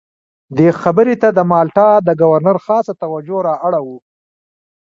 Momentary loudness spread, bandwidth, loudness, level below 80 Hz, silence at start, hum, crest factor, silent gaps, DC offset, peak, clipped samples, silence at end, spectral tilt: 10 LU; 7.4 kHz; -13 LUFS; -56 dBFS; 0.5 s; none; 14 dB; none; under 0.1%; 0 dBFS; under 0.1%; 0.85 s; -9 dB/octave